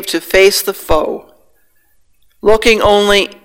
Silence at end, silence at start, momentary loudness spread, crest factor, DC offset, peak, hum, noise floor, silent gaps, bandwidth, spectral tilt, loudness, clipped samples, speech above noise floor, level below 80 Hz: 0.1 s; 0 s; 8 LU; 14 dB; under 0.1%; 0 dBFS; none; -57 dBFS; none; 17 kHz; -3 dB/octave; -11 LUFS; 0.4%; 46 dB; -32 dBFS